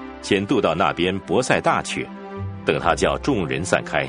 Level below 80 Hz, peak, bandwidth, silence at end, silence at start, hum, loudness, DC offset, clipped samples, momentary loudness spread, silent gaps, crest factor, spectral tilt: -42 dBFS; 0 dBFS; 10.5 kHz; 0 s; 0 s; none; -21 LUFS; under 0.1%; under 0.1%; 9 LU; none; 20 dB; -4.5 dB/octave